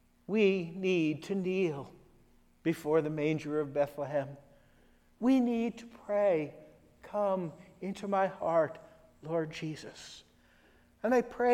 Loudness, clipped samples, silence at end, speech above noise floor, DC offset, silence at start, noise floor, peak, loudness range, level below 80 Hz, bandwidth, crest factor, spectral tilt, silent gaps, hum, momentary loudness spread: -32 LUFS; under 0.1%; 0 s; 33 dB; under 0.1%; 0.3 s; -64 dBFS; -16 dBFS; 3 LU; -68 dBFS; 15.5 kHz; 18 dB; -7 dB/octave; none; none; 16 LU